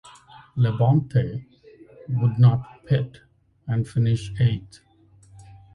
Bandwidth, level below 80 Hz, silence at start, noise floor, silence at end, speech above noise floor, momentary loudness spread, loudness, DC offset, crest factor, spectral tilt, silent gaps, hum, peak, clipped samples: 10 kHz; -50 dBFS; 0.55 s; -52 dBFS; 0.35 s; 31 dB; 16 LU; -23 LUFS; under 0.1%; 18 dB; -8.5 dB/octave; none; none; -6 dBFS; under 0.1%